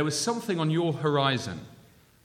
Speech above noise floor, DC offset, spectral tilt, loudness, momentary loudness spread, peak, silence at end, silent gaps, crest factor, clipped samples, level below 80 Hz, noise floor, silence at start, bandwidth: 29 dB; under 0.1%; -5 dB/octave; -27 LUFS; 10 LU; -10 dBFS; 0.5 s; none; 18 dB; under 0.1%; -66 dBFS; -56 dBFS; 0 s; 16 kHz